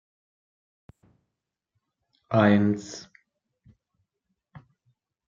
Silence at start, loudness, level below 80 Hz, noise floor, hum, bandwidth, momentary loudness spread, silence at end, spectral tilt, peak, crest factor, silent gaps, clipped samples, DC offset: 2.3 s; -23 LUFS; -70 dBFS; -85 dBFS; none; 7.6 kHz; 21 LU; 2.25 s; -7 dB/octave; -6 dBFS; 24 dB; none; under 0.1%; under 0.1%